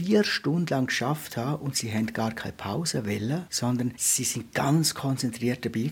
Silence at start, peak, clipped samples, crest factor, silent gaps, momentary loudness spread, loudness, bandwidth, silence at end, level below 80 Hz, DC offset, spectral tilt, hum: 0 s; -10 dBFS; under 0.1%; 16 dB; none; 7 LU; -27 LUFS; 17 kHz; 0 s; -62 dBFS; under 0.1%; -4 dB/octave; none